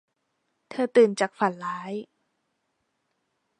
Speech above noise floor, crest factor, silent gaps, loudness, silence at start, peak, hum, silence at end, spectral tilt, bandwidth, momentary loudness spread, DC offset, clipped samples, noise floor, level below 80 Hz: 53 dB; 20 dB; none; -24 LUFS; 0.7 s; -8 dBFS; none; 1.55 s; -5 dB/octave; 10 kHz; 16 LU; under 0.1%; under 0.1%; -76 dBFS; -82 dBFS